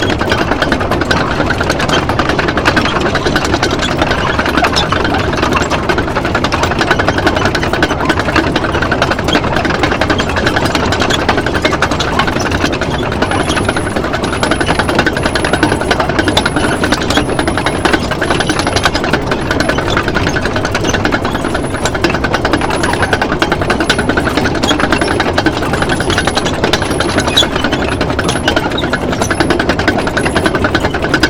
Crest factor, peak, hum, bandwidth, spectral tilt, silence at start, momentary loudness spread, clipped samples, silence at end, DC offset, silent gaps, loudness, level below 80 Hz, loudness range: 12 dB; 0 dBFS; none; 18.5 kHz; -4.5 dB/octave; 0 s; 3 LU; 0.2%; 0 s; under 0.1%; none; -13 LUFS; -26 dBFS; 1 LU